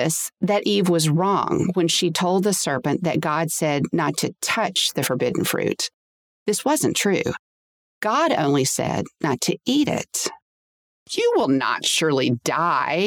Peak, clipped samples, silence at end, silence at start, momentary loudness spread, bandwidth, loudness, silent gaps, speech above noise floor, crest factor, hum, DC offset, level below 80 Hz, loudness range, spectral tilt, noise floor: -8 dBFS; under 0.1%; 0 s; 0 s; 6 LU; over 20 kHz; -21 LUFS; 5.94-6.46 s, 7.39-8.01 s, 10.42-11.06 s; over 69 dB; 14 dB; none; under 0.1%; -60 dBFS; 3 LU; -4 dB/octave; under -90 dBFS